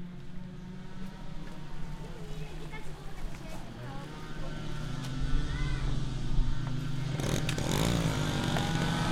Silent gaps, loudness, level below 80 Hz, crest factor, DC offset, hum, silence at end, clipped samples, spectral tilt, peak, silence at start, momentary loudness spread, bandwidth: none; -35 LUFS; -36 dBFS; 16 dB; under 0.1%; none; 0 s; under 0.1%; -5 dB/octave; -14 dBFS; 0 s; 15 LU; 14.5 kHz